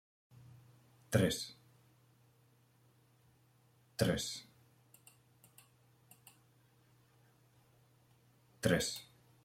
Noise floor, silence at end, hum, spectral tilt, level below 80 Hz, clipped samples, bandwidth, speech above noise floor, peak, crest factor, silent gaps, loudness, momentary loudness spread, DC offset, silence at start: -70 dBFS; 0.4 s; none; -4.5 dB/octave; -68 dBFS; under 0.1%; 16.5 kHz; 35 dB; -14 dBFS; 28 dB; none; -37 LUFS; 28 LU; under 0.1%; 1.1 s